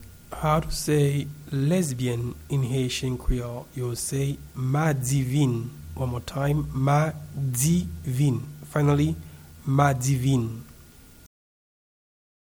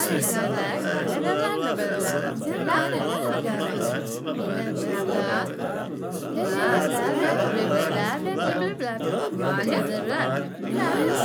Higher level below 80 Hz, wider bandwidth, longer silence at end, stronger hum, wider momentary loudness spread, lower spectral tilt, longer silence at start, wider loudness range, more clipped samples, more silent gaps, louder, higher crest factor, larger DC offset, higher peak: first, -40 dBFS vs -72 dBFS; second, 17.5 kHz vs over 20 kHz; first, 1.75 s vs 0 s; neither; first, 9 LU vs 6 LU; first, -6 dB/octave vs -4.5 dB/octave; about the same, 0 s vs 0 s; about the same, 3 LU vs 2 LU; neither; neither; about the same, -26 LUFS vs -25 LUFS; about the same, 18 dB vs 16 dB; neither; first, -6 dBFS vs -10 dBFS